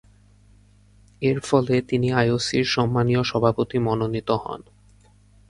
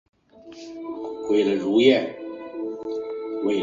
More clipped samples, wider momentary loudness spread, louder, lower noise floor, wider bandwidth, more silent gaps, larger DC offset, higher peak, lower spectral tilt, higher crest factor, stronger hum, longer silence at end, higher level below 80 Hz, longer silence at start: neither; second, 6 LU vs 18 LU; about the same, -22 LUFS vs -23 LUFS; first, -54 dBFS vs -45 dBFS; first, 11.5 kHz vs 7.4 kHz; neither; neither; about the same, -4 dBFS vs -4 dBFS; about the same, -6 dB/octave vs -5.5 dB/octave; about the same, 20 dB vs 20 dB; neither; first, 0.9 s vs 0 s; first, -50 dBFS vs -66 dBFS; first, 1.2 s vs 0.35 s